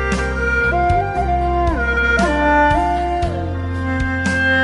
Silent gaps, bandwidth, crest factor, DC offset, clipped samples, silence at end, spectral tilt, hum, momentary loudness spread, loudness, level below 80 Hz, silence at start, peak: none; 11.5 kHz; 12 dB; under 0.1%; under 0.1%; 0 s; -6 dB/octave; none; 7 LU; -17 LUFS; -24 dBFS; 0 s; -4 dBFS